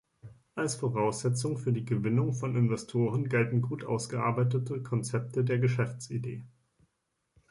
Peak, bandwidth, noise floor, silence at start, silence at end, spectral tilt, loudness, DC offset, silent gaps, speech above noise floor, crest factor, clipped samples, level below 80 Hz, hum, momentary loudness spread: -14 dBFS; 11.5 kHz; -80 dBFS; 0.25 s; 1.05 s; -6.5 dB/octave; -31 LUFS; under 0.1%; none; 51 dB; 16 dB; under 0.1%; -66 dBFS; none; 7 LU